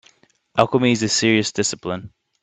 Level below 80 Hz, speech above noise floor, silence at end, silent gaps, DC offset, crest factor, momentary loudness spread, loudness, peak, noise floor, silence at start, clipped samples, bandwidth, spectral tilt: -58 dBFS; 38 dB; 0.35 s; none; under 0.1%; 20 dB; 12 LU; -19 LUFS; 0 dBFS; -57 dBFS; 0.55 s; under 0.1%; 9.4 kHz; -4 dB/octave